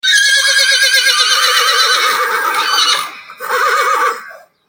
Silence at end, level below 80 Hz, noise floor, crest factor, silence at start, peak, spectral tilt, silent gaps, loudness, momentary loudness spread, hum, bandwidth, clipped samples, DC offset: 0.3 s; -66 dBFS; -35 dBFS; 12 dB; 0.05 s; 0 dBFS; 3.5 dB/octave; none; -10 LUFS; 9 LU; none; 17 kHz; under 0.1%; under 0.1%